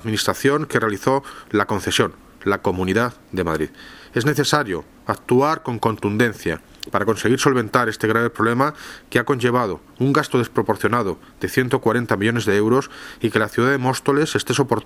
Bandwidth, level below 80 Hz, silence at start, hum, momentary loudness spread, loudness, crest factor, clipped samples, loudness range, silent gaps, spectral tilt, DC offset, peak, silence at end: 17.5 kHz; -50 dBFS; 0 s; none; 9 LU; -20 LUFS; 20 dB; under 0.1%; 2 LU; none; -5 dB/octave; under 0.1%; 0 dBFS; 0 s